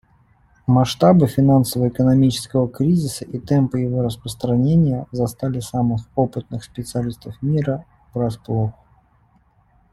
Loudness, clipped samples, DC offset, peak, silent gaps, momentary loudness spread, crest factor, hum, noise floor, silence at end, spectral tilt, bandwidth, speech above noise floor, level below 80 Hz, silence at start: -19 LUFS; under 0.1%; under 0.1%; -2 dBFS; none; 12 LU; 18 dB; none; -57 dBFS; 1.2 s; -7.5 dB/octave; 15 kHz; 39 dB; -46 dBFS; 0.7 s